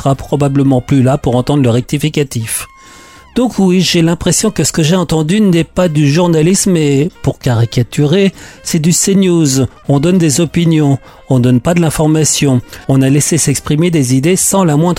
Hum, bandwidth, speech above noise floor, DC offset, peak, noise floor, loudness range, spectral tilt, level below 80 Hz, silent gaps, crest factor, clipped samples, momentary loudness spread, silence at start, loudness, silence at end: none; 16.5 kHz; 26 dB; under 0.1%; -2 dBFS; -37 dBFS; 2 LU; -5.5 dB/octave; -36 dBFS; none; 10 dB; under 0.1%; 6 LU; 0 s; -11 LUFS; 0 s